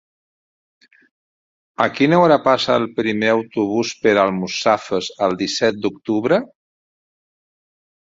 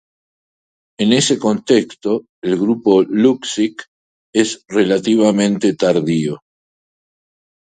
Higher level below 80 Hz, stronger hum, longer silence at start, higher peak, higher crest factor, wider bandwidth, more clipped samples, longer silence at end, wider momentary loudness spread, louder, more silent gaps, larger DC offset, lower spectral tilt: about the same, -60 dBFS vs -60 dBFS; neither; first, 1.8 s vs 1 s; about the same, -2 dBFS vs 0 dBFS; about the same, 18 dB vs 16 dB; second, 7.8 kHz vs 9.4 kHz; neither; first, 1.65 s vs 1.4 s; about the same, 7 LU vs 8 LU; about the same, -18 LUFS vs -16 LUFS; second, none vs 2.29-2.42 s, 3.88-4.33 s; neither; about the same, -5 dB/octave vs -5 dB/octave